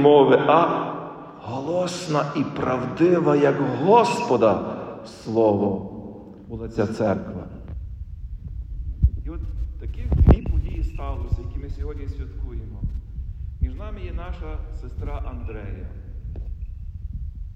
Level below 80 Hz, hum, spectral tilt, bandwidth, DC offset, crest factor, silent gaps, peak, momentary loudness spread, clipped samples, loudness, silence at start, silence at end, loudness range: -30 dBFS; none; -7.5 dB/octave; 10 kHz; under 0.1%; 20 dB; none; -4 dBFS; 19 LU; under 0.1%; -23 LUFS; 0 s; 0 s; 13 LU